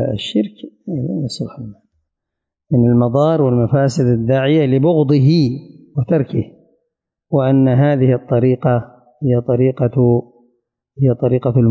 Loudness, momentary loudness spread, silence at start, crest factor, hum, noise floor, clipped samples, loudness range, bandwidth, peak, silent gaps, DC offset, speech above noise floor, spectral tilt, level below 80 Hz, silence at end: -15 LUFS; 12 LU; 0 s; 12 dB; none; -80 dBFS; under 0.1%; 3 LU; 7.8 kHz; -4 dBFS; none; under 0.1%; 66 dB; -8.5 dB/octave; -48 dBFS; 0 s